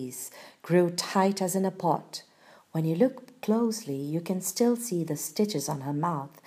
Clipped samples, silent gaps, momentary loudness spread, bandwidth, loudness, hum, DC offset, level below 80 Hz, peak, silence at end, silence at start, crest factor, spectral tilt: under 0.1%; none; 11 LU; 15.5 kHz; -28 LUFS; none; under 0.1%; -78 dBFS; -10 dBFS; 0.05 s; 0 s; 18 dB; -5.5 dB/octave